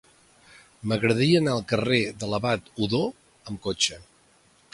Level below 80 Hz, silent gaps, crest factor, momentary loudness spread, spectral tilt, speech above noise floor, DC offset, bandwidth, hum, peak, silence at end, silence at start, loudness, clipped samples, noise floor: -56 dBFS; none; 20 dB; 13 LU; -4.5 dB/octave; 36 dB; under 0.1%; 11.5 kHz; none; -6 dBFS; 0.7 s; 0.85 s; -25 LUFS; under 0.1%; -60 dBFS